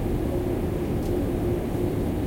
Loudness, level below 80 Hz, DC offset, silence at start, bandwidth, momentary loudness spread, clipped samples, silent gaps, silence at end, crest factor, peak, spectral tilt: -27 LUFS; -34 dBFS; under 0.1%; 0 s; 16.5 kHz; 1 LU; under 0.1%; none; 0 s; 12 dB; -14 dBFS; -8 dB/octave